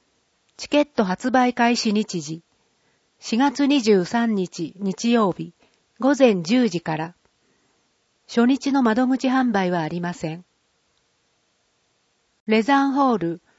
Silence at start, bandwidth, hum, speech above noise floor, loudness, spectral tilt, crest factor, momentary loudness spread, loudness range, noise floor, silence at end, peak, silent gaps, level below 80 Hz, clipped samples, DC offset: 0.6 s; 8 kHz; none; 48 dB; -21 LUFS; -5.5 dB/octave; 18 dB; 14 LU; 4 LU; -68 dBFS; 0.2 s; -4 dBFS; 12.40-12.46 s; -64 dBFS; under 0.1%; under 0.1%